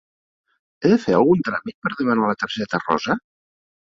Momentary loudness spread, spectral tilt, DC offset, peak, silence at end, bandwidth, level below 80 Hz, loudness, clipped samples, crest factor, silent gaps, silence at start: 9 LU; -6.5 dB/octave; under 0.1%; -4 dBFS; 0.7 s; 7.6 kHz; -58 dBFS; -20 LUFS; under 0.1%; 18 dB; 1.74-1.82 s; 0.8 s